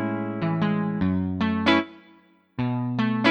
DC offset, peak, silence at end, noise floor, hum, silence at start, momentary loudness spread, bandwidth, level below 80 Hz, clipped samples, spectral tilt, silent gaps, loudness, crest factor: under 0.1%; -6 dBFS; 0 s; -56 dBFS; none; 0 s; 8 LU; 8.2 kHz; -54 dBFS; under 0.1%; -7.5 dB/octave; none; -25 LUFS; 18 dB